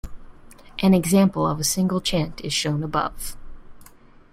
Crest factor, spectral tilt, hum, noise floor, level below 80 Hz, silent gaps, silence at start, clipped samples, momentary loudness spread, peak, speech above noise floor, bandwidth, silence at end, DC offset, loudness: 18 dB; -5 dB/octave; none; -48 dBFS; -42 dBFS; none; 0.05 s; under 0.1%; 13 LU; -4 dBFS; 27 dB; 16 kHz; 0.45 s; under 0.1%; -21 LUFS